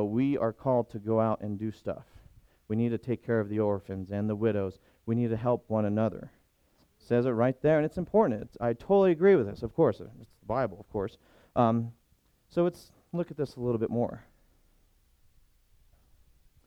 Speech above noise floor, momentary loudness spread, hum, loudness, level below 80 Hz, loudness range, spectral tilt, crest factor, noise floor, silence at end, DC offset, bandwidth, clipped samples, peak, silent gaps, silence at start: 39 dB; 12 LU; none; -29 LUFS; -58 dBFS; 8 LU; -9.5 dB/octave; 18 dB; -68 dBFS; 2.45 s; under 0.1%; 12 kHz; under 0.1%; -12 dBFS; none; 0 s